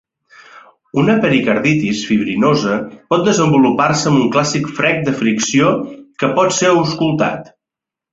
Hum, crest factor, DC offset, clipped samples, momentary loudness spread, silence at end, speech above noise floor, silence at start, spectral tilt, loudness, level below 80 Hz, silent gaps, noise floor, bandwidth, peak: none; 14 dB; under 0.1%; under 0.1%; 7 LU; 0.65 s; 71 dB; 0.55 s; -5 dB/octave; -14 LUFS; -52 dBFS; none; -85 dBFS; 8 kHz; -2 dBFS